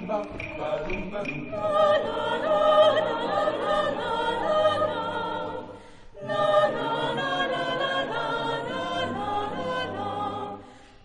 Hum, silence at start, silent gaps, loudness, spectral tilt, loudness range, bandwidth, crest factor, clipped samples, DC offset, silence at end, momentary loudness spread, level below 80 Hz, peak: none; 0 s; none; -26 LUFS; -5 dB/octave; 5 LU; 10 kHz; 18 dB; under 0.1%; under 0.1%; 0.2 s; 10 LU; -50 dBFS; -8 dBFS